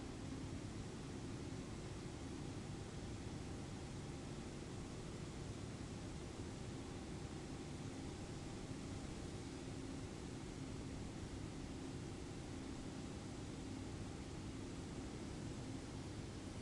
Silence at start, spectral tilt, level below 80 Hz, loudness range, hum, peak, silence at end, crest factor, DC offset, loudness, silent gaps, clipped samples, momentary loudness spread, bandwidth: 0 s; -5.5 dB/octave; -58 dBFS; 0 LU; none; -36 dBFS; 0 s; 12 dB; under 0.1%; -50 LUFS; none; under 0.1%; 1 LU; 11.5 kHz